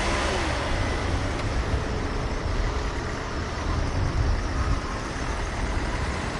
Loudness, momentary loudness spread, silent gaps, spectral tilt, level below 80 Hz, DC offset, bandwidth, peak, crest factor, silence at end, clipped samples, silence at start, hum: -28 LUFS; 4 LU; none; -5 dB/octave; -30 dBFS; under 0.1%; 11.5 kHz; -12 dBFS; 14 dB; 0 s; under 0.1%; 0 s; none